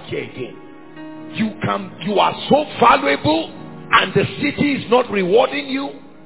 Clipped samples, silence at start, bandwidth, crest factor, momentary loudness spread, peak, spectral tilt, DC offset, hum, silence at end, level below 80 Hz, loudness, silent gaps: under 0.1%; 0 s; 4 kHz; 18 dB; 17 LU; 0 dBFS; -9.5 dB/octave; 0.7%; none; 0.25 s; -50 dBFS; -17 LUFS; none